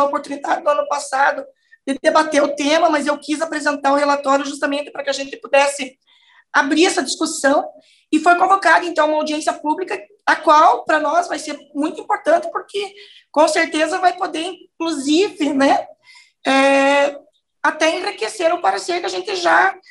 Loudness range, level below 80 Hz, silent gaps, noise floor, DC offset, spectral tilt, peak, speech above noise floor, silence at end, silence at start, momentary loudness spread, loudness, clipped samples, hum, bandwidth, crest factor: 3 LU; -70 dBFS; none; -49 dBFS; under 0.1%; -1.5 dB/octave; -2 dBFS; 32 dB; 0.15 s; 0 s; 11 LU; -17 LUFS; under 0.1%; none; 12 kHz; 16 dB